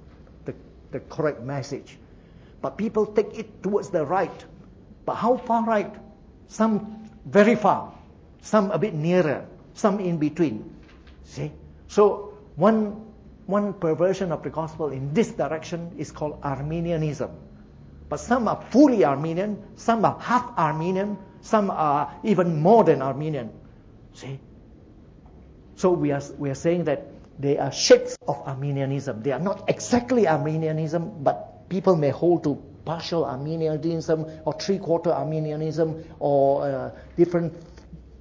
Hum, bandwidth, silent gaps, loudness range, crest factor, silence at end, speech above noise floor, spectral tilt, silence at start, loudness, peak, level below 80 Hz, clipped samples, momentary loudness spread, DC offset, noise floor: none; 8 kHz; none; 6 LU; 20 dB; 0.05 s; 26 dB; -6.5 dB/octave; 0.4 s; -24 LUFS; -4 dBFS; -52 dBFS; under 0.1%; 15 LU; under 0.1%; -49 dBFS